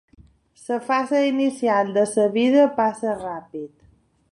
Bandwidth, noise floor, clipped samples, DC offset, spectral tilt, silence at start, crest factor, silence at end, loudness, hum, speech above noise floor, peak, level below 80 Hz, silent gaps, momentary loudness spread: 11.5 kHz; -58 dBFS; under 0.1%; under 0.1%; -5 dB/octave; 0.7 s; 16 dB; 0.65 s; -21 LUFS; none; 37 dB; -6 dBFS; -62 dBFS; none; 18 LU